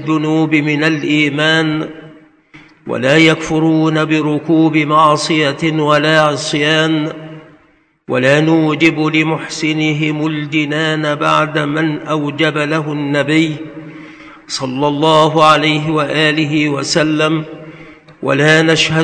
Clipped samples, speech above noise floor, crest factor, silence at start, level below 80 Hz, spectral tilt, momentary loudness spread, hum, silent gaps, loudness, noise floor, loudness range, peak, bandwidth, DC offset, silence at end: 0.2%; 39 dB; 14 dB; 0 s; -52 dBFS; -5 dB/octave; 11 LU; none; none; -13 LUFS; -52 dBFS; 3 LU; 0 dBFS; 9.4 kHz; under 0.1%; 0 s